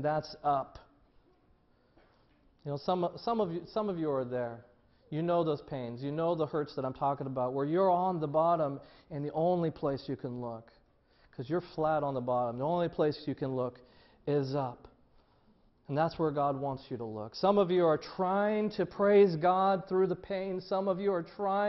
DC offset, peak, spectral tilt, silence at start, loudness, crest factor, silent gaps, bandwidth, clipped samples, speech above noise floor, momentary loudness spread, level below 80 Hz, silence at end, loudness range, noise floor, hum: under 0.1%; -14 dBFS; -8.5 dB/octave; 0 s; -32 LUFS; 18 dB; none; 6 kHz; under 0.1%; 36 dB; 13 LU; -66 dBFS; 0 s; 7 LU; -67 dBFS; none